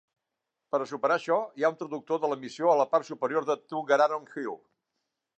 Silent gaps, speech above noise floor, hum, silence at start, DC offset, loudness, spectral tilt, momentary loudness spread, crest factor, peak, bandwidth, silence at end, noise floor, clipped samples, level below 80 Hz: none; 58 dB; none; 0.75 s; under 0.1%; -28 LUFS; -5 dB/octave; 12 LU; 20 dB; -10 dBFS; 8.6 kHz; 0.8 s; -85 dBFS; under 0.1%; -88 dBFS